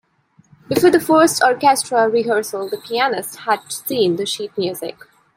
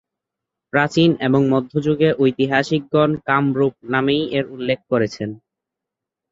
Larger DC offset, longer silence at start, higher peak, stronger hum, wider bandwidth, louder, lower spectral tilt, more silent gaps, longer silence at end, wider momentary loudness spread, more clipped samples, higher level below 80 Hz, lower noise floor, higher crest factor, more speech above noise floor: neither; about the same, 0.7 s vs 0.75 s; about the same, -2 dBFS vs -2 dBFS; neither; first, 16.5 kHz vs 7.8 kHz; about the same, -17 LUFS vs -18 LUFS; second, -3.5 dB/octave vs -7 dB/octave; neither; second, 0.45 s vs 0.95 s; first, 11 LU vs 7 LU; neither; second, -62 dBFS vs -56 dBFS; second, -56 dBFS vs -84 dBFS; about the same, 16 dB vs 18 dB; second, 39 dB vs 67 dB